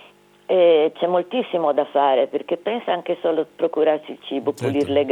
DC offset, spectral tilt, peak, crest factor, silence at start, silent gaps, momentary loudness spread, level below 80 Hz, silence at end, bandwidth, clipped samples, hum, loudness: under 0.1%; -6.5 dB/octave; -6 dBFS; 14 dB; 0.5 s; none; 9 LU; -70 dBFS; 0 s; 10.5 kHz; under 0.1%; 50 Hz at -70 dBFS; -20 LUFS